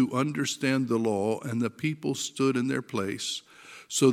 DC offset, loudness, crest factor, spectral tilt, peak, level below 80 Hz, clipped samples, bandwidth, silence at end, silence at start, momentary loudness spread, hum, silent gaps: under 0.1%; -29 LUFS; 18 dB; -4.5 dB/octave; -10 dBFS; -74 dBFS; under 0.1%; 16 kHz; 0 s; 0 s; 6 LU; none; none